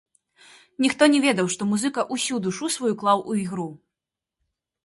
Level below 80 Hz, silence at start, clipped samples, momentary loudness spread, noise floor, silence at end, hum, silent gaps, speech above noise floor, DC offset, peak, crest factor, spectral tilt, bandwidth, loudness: -68 dBFS; 0.8 s; under 0.1%; 10 LU; -87 dBFS; 1.1 s; none; none; 65 dB; under 0.1%; -2 dBFS; 22 dB; -4 dB/octave; 11.5 kHz; -23 LUFS